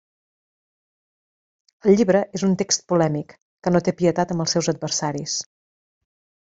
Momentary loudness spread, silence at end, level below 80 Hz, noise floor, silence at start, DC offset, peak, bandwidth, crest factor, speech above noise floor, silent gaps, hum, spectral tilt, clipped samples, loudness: 10 LU; 1.1 s; -58 dBFS; under -90 dBFS; 1.85 s; under 0.1%; -4 dBFS; 8 kHz; 20 dB; over 70 dB; 3.42-3.57 s; none; -4.5 dB/octave; under 0.1%; -21 LUFS